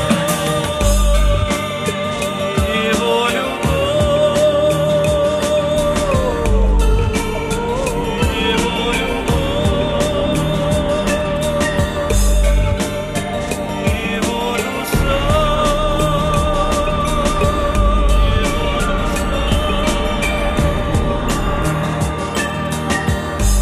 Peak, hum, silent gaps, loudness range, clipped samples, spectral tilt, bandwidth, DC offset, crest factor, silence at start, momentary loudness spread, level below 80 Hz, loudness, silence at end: -2 dBFS; none; none; 3 LU; under 0.1%; -5 dB/octave; 15 kHz; under 0.1%; 14 dB; 0 s; 4 LU; -20 dBFS; -17 LUFS; 0 s